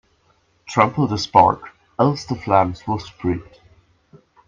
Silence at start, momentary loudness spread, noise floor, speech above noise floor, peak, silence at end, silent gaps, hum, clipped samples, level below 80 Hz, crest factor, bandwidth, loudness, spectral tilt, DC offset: 0.7 s; 12 LU; -61 dBFS; 43 dB; 0 dBFS; 1.05 s; none; none; under 0.1%; -52 dBFS; 20 dB; 7.6 kHz; -19 LUFS; -6.5 dB/octave; under 0.1%